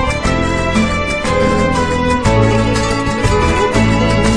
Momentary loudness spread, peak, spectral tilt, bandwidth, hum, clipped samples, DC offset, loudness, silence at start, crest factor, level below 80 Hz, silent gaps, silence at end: 3 LU; 0 dBFS; -5.5 dB/octave; 11 kHz; none; under 0.1%; under 0.1%; -14 LUFS; 0 s; 12 dB; -22 dBFS; none; 0 s